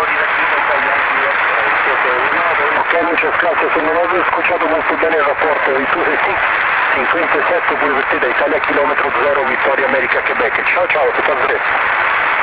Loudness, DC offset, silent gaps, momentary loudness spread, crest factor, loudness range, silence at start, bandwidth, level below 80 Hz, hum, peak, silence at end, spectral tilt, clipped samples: -13 LUFS; under 0.1%; none; 1 LU; 12 dB; 1 LU; 0 s; 4 kHz; -48 dBFS; none; -2 dBFS; 0 s; -6.5 dB/octave; under 0.1%